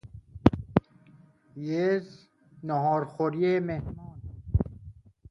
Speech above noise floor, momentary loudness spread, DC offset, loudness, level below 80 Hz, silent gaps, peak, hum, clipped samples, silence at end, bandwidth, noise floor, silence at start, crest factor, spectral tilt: 29 dB; 18 LU; under 0.1%; -28 LUFS; -44 dBFS; none; 0 dBFS; none; under 0.1%; 0.4 s; 7 kHz; -57 dBFS; 0.05 s; 28 dB; -9 dB/octave